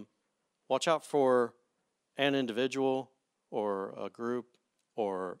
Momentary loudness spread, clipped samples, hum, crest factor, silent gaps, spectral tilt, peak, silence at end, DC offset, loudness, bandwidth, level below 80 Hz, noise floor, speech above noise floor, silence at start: 13 LU; under 0.1%; none; 20 dB; none; -4.5 dB/octave; -14 dBFS; 0.05 s; under 0.1%; -32 LUFS; 13.5 kHz; -90 dBFS; -81 dBFS; 49 dB; 0 s